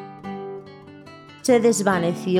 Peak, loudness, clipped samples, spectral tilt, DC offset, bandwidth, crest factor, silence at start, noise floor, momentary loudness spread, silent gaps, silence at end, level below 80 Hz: -6 dBFS; -20 LUFS; under 0.1%; -5 dB/octave; under 0.1%; 16.5 kHz; 18 dB; 0 s; -43 dBFS; 25 LU; none; 0 s; -68 dBFS